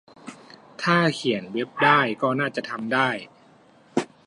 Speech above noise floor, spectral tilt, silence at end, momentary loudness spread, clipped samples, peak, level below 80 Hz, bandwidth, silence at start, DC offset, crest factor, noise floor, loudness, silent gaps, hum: 32 dB; -5.5 dB/octave; 0.2 s; 14 LU; under 0.1%; -4 dBFS; -72 dBFS; 11.5 kHz; 0.25 s; under 0.1%; 20 dB; -54 dBFS; -23 LUFS; none; none